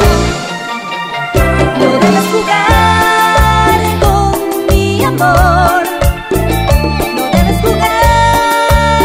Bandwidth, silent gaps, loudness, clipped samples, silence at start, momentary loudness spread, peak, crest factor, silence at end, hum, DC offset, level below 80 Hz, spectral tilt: 16.5 kHz; none; -10 LUFS; 0.2%; 0 s; 7 LU; 0 dBFS; 10 dB; 0 s; none; under 0.1%; -18 dBFS; -5 dB/octave